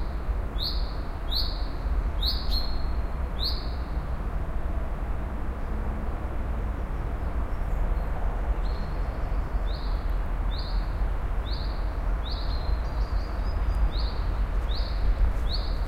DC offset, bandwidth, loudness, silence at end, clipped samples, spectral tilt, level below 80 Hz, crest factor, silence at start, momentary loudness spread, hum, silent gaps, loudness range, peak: under 0.1%; 14 kHz; -31 LUFS; 0 s; under 0.1%; -6.5 dB/octave; -28 dBFS; 14 dB; 0 s; 5 LU; none; none; 3 LU; -12 dBFS